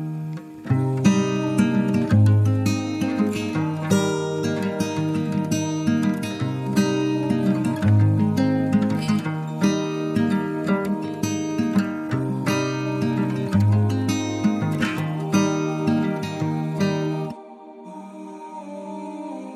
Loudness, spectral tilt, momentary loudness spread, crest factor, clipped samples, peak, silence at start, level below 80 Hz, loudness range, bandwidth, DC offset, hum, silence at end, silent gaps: -22 LUFS; -6.5 dB/octave; 14 LU; 18 dB; under 0.1%; -4 dBFS; 0 s; -58 dBFS; 3 LU; 14 kHz; under 0.1%; none; 0 s; none